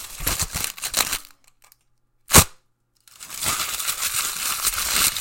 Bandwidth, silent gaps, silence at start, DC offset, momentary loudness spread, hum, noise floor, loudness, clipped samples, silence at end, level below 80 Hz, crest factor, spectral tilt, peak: 17 kHz; none; 0 s; under 0.1%; 12 LU; none; -65 dBFS; -20 LUFS; under 0.1%; 0 s; -38 dBFS; 24 dB; -1.5 dB/octave; 0 dBFS